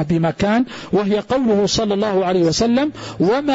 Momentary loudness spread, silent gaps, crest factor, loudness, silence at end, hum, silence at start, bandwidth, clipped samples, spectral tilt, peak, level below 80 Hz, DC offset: 4 LU; none; 10 dB; -18 LUFS; 0 s; none; 0 s; 8 kHz; under 0.1%; -5.5 dB/octave; -6 dBFS; -44 dBFS; under 0.1%